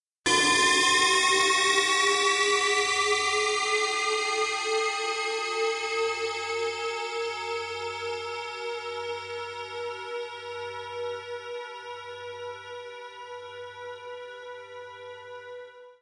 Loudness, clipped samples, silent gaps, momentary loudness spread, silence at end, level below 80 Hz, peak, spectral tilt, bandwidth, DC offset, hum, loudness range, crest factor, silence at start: -25 LUFS; under 0.1%; none; 20 LU; 0.1 s; -70 dBFS; -12 dBFS; 0 dB/octave; 11.5 kHz; under 0.1%; none; 18 LU; 18 dB; 0.25 s